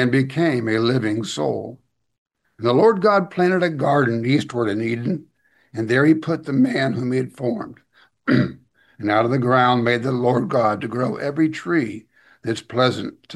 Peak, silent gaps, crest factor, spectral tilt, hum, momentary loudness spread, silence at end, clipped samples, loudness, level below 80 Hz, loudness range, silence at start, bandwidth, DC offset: -2 dBFS; 2.18-2.25 s; 18 dB; -7 dB/octave; none; 12 LU; 0 s; under 0.1%; -20 LUFS; -62 dBFS; 2 LU; 0 s; 12 kHz; under 0.1%